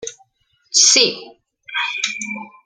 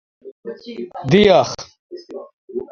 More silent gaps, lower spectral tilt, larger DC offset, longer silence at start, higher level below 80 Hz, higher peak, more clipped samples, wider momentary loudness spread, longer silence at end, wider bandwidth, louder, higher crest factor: second, none vs 0.32-0.43 s, 1.79-1.90 s, 2.33-2.48 s; second, 1 dB/octave vs -5.5 dB/octave; neither; second, 0 s vs 0.25 s; second, -70 dBFS vs -48 dBFS; about the same, 0 dBFS vs 0 dBFS; neither; second, 19 LU vs 24 LU; about the same, 0.15 s vs 0.05 s; first, 13.5 kHz vs 7.4 kHz; about the same, -15 LUFS vs -15 LUFS; about the same, 20 dB vs 18 dB